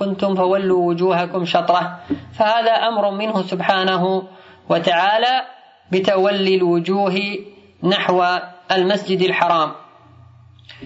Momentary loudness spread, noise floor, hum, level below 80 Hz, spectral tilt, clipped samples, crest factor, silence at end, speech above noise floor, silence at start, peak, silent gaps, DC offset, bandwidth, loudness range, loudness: 8 LU; -46 dBFS; none; -64 dBFS; -6 dB/octave; under 0.1%; 16 dB; 0 s; 28 dB; 0 s; -2 dBFS; none; under 0.1%; 8 kHz; 1 LU; -18 LUFS